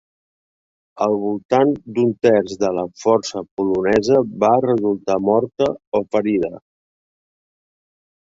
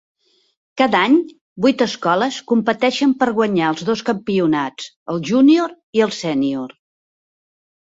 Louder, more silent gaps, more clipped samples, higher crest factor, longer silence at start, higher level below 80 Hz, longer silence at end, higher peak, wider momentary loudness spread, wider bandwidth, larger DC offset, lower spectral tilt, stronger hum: about the same, -19 LUFS vs -17 LUFS; second, 1.45-1.49 s, 3.51-3.57 s, 5.87-5.92 s vs 1.41-1.56 s, 4.96-5.06 s, 5.83-5.93 s; neither; about the same, 18 dB vs 16 dB; first, 0.95 s vs 0.75 s; first, -56 dBFS vs -62 dBFS; first, 1.7 s vs 1.25 s; about the same, -2 dBFS vs -2 dBFS; second, 6 LU vs 12 LU; about the same, 7.8 kHz vs 7.8 kHz; neither; about the same, -6 dB/octave vs -5.5 dB/octave; neither